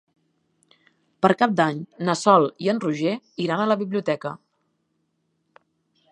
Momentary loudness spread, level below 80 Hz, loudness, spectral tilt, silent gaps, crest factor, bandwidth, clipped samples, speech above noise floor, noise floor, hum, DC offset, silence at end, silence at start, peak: 10 LU; -74 dBFS; -22 LUFS; -5.5 dB/octave; none; 22 dB; 10.5 kHz; under 0.1%; 51 dB; -72 dBFS; none; under 0.1%; 1.75 s; 1.2 s; -2 dBFS